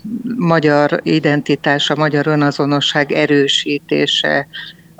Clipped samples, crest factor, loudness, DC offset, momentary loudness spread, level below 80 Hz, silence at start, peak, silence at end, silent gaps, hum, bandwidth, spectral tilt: under 0.1%; 14 dB; -14 LUFS; under 0.1%; 6 LU; -58 dBFS; 0.05 s; 0 dBFS; 0.3 s; none; none; 8.8 kHz; -5 dB/octave